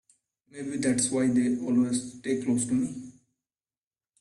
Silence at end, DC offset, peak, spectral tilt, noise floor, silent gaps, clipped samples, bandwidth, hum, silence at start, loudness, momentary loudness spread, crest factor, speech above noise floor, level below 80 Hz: 1.1 s; under 0.1%; -12 dBFS; -4.5 dB/octave; under -90 dBFS; none; under 0.1%; 11.5 kHz; none; 0.55 s; -27 LUFS; 10 LU; 16 dB; over 63 dB; -64 dBFS